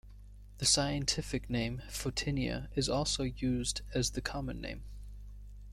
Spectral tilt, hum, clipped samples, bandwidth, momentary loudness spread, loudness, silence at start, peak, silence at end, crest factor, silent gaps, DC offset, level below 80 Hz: -3.5 dB/octave; 50 Hz at -45 dBFS; under 0.1%; 15.5 kHz; 21 LU; -34 LUFS; 0.05 s; -14 dBFS; 0 s; 22 dB; none; under 0.1%; -46 dBFS